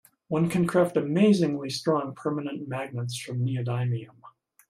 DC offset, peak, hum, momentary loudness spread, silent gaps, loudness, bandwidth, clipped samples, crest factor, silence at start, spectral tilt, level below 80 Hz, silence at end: under 0.1%; -10 dBFS; none; 11 LU; none; -27 LUFS; 15 kHz; under 0.1%; 16 dB; 0.3 s; -6.5 dB/octave; -66 dBFS; 0.4 s